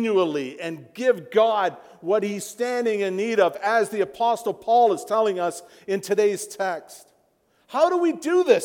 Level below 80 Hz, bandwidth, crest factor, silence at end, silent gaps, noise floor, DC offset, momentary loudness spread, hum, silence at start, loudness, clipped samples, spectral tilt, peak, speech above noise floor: -74 dBFS; 18 kHz; 18 dB; 0 s; none; -65 dBFS; under 0.1%; 10 LU; none; 0 s; -23 LUFS; under 0.1%; -4.5 dB/octave; -4 dBFS; 42 dB